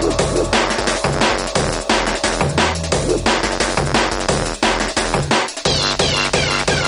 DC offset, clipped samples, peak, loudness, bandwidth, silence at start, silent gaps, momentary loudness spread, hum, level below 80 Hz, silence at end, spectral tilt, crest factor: under 0.1%; under 0.1%; -2 dBFS; -17 LUFS; over 20 kHz; 0 s; none; 2 LU; none; -30 dBFS; 0 s; -3.5 dB/octave; 16 dB